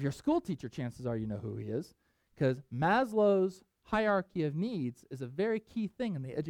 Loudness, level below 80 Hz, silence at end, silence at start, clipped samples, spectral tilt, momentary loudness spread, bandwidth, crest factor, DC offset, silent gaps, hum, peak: -33 LUFS; -62 dBFS; 0 s; 0 s; under 0.1%; -7.5 dB/octave; 12 LU; 15.5 kHz; 16 dB; under 0.1%; none; none; -18 dBFS